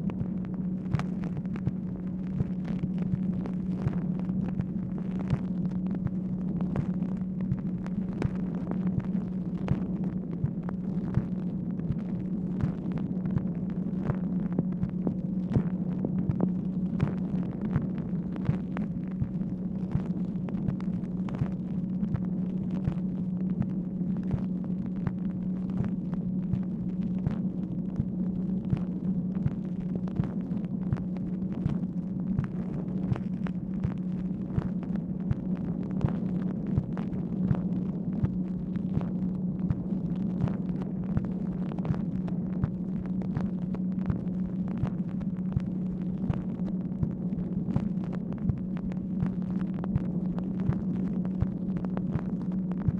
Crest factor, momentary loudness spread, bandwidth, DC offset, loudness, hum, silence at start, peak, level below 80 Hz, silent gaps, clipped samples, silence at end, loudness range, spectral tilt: 18 dB; 3 LU; 4.1 kHz; under 0.1%; -31 LUFS; none; 0 s; -12 dBFS; -48 dBFS; none; under 0.1%; 0 s; 1 LU; -11 dB/octave